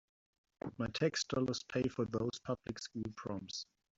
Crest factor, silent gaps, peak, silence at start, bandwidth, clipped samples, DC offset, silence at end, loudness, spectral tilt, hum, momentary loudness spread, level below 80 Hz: 20 dB; none; -20 dBFS; 0.65 s; 8 kHz; under 0.1%; under 0.1%; 0.35 s; -39 LUFS; -5 dB/octave; none; 10 LU; -66 dBFS